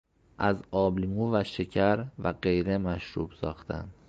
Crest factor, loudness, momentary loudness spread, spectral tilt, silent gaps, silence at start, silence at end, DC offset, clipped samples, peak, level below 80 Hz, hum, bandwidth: 20 dB; -29 LUFS; 9 LU; -8 dB/octave; none; 0.4 s; 0.15 s; under 0.1%; under 0.1%; -10 dBFS; -48 dBFS; none; 7.8 kHz